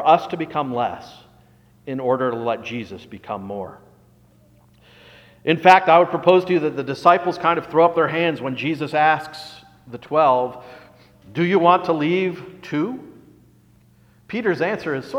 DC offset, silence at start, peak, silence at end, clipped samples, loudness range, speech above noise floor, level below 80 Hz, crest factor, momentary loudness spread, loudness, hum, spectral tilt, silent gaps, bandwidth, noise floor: under 0.1%; 0 s; 0 dBFS; 0 s; under 0.1%; 11 LU; 35 dB; -62 dBFS; 20 dB; 20 LU; -19 LUFS; 60 Hz at -55 dBFS; -6.5 dB/octave; none; 13.5 kHz; -54 dBFS